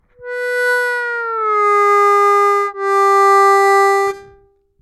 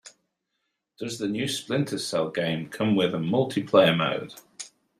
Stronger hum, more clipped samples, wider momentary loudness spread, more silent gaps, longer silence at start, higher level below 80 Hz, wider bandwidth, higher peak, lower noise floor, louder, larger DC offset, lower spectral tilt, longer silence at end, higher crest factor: neither; neither; second, 10 LU vs 18 LU; neither; first, 0.2 s vs 0.05 s; first, -62 dBFS vs -68 dBFS; about the same, 15.5 kHz vs 15.5 kHz; about the same, -4 dBFS vs -4 dBFS; second, -51 dBFS vs -79 dBFS; first, -13 LUFS vs -25 LUFS; neither; second, -1.5 dB/octave vs -5 dB/octave; first, 0.6 s vs 0.3 s; second, 10 dB vs 22 dB